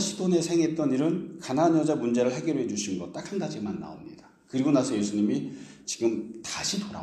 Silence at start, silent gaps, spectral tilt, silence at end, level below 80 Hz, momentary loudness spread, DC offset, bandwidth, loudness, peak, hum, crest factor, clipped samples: 0 s; none; -5 dB/octave; 0 s; -66 dBFS; 11 LU; under 0.1%; 12.5 kHz; -27 LUFS; -10 dBFS; none; 18 dB; under 0.1%